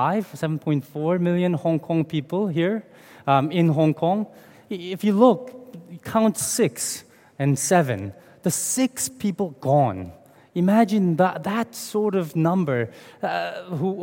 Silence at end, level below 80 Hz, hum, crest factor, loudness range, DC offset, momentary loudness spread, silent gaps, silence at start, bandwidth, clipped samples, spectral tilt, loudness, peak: 0 s; -66 dBFS; none; 20 dB; 2 LU; under 0.1%; 13 LU; none; 0 s; 17 kHz; under 0.1%; -5.5 dB/octave; -23 LUFS; -2 dBFS